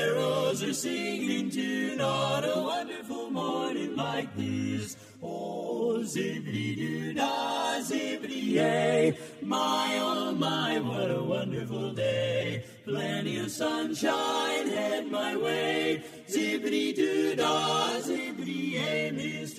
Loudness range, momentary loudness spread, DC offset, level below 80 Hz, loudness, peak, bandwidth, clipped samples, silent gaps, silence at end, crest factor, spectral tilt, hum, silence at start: 4 LU; 7 LU; under 0.1%; -72 dBFS; -30 LUFS; -14 dBFS; 15.5 kHz; under 0.1%; none; 0 s; 16 dB; -4.5 dB/octave; none; 0 s